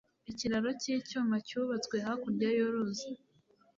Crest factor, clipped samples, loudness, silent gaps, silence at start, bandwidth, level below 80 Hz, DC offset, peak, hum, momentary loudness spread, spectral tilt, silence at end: 14 dB; under 0.1%; -34 LUFS; none; 0.3 s; 7.6 kHz; -70 dBFS; under 0.1%; -22 dBFS; none; 10 LU; -4.5 dB/octave; 0.6 s